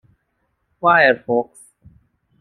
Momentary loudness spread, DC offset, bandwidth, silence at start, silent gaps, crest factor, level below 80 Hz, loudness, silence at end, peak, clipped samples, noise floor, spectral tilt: 10 LU; under 0.1%; 12 kHz; 0.85 s; none; 20 dB; -62 dBFS; -16 LUFS; 1 s; -2 dBFS; under 0.1%; -70 dBFS; -5.5 dB/octave